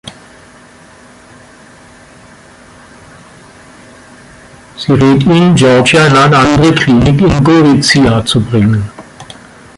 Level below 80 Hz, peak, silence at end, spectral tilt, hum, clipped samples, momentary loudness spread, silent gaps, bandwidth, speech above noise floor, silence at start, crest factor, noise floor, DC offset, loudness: -32 dBFS; 0 dBFS; 0.55 s; -5.5 dB/octave; none; under 0.1%; 9 LU; none; 11.5 kHz; 31 dB; 0.05 s; 10 dB; -38 dBFS; under 0.1%; -8 LUFS